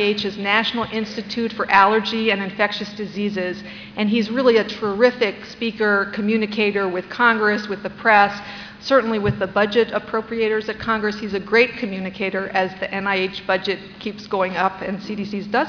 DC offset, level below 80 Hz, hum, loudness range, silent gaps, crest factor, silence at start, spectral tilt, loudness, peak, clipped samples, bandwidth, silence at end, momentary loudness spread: under 0.1%; -52 dBFS; none; 3 LU; none; 18 dB; 0 s; -5.5 dB/octave; -20 LUFS; -2 dBFS; under 0.1%; 5.4 kHz; 0 s; 11 LU